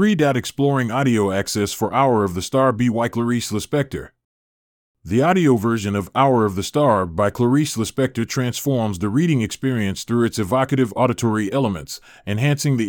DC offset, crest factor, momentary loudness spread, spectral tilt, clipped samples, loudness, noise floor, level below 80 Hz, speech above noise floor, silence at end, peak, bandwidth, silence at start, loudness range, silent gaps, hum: under 0.1%; 16 dB; 5 LU; -6 dB/octave; under 0.1%; -19 LUFS; under -90 dBFS; -52 dBFS; over 71 dB; 0 s; -4 dBFS; 19 kHz; 0 s; 3 LU; 4.25-4.95 s; none